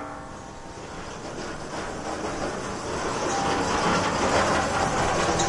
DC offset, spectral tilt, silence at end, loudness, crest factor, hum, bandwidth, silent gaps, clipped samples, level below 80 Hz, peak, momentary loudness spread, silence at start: under 0.1%; -3.5 dB/octave; 0 s; -26 LUFS; 16 dB; none; 11.5 kHz; none; under 0.1%; -44 dBFS; -10 dBFS; 15 LU; 0 s